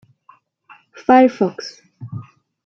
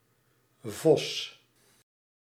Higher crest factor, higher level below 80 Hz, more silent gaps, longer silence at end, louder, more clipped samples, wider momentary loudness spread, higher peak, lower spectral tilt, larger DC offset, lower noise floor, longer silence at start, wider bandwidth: about the same, 18 dB vs 22 dB; first, -64 dBFS vs -80 dBFS; neither; second, 0.45 s vs 1 s; first, -15 LUFS vs -28 LUFS; neither; first, 22 LU vs 17 LU; first, -2 dBFS vs -10 dBFS; first, -6.5 dB/octave vs -4.5 dB/octave; neither; second, -53 dBFS vs -69 dBFS; first, 1.1 s vs 0.65 s; second, 6.6 kHz vs 16 kHz